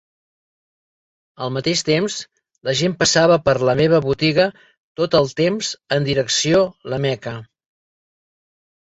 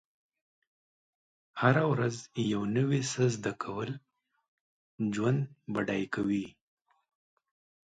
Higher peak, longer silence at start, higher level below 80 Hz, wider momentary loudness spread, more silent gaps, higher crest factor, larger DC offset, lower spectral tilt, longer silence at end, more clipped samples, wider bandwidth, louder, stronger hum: first, -2 dBFS vs -12 dBFS; second, 1.4 s vs 1.55 s; first, -52 dBFS vs -68 dBFS; first, 13 LU vs 10 LU; second, 4.77-4.96 s vs 4.48-4.98 s; about the same, 18 dB vs 22 dB; neither; second, -4 dB/octave vs -6 dB/octave; about the same, 1.4 s vs 1.4 s; neither; second, 8.2 kHz vs 9.4 kHz; first, -18 LUFS vs -31 LUFS; neither